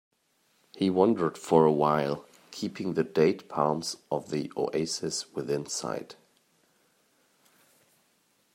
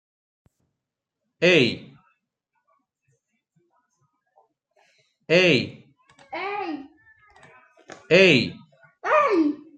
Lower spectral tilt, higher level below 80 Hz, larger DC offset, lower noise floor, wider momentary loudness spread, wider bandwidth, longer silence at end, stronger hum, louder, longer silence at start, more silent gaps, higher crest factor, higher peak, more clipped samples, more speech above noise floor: about the same, -5 dB/octave vs -5 dB/octave; about the same, -70 dBFS vs -68 dBFS; neither; second, -70 dBFS vs -84 dBFS; second, 13 LU vs 18 LU; first, 16 kHz vs 9 kHz; first, 2.4 s vs 0.2 s; neither; second, -28 LUFS vs -20 LUFS; second, 0.75 s vs 1.4 s; neither; about the same, 22 dB vs 22 dB; second, -8 dBFS vs -4 dBFS; neither; second, 43 dB vs 66 dB